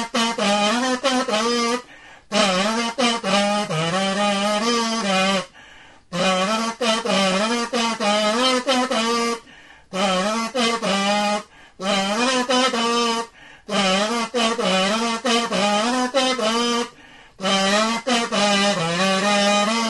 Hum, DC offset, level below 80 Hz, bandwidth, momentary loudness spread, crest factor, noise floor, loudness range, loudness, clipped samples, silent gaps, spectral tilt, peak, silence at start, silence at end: none; 0.1%; -60 dBFS; 11.5 kHz; 6 LU; 16 dB; -47 dBFS; 1 LU; -20 LUFS; under 0.1%; none; -3 dB/octave; -6 dBFS; 0 s; 0 s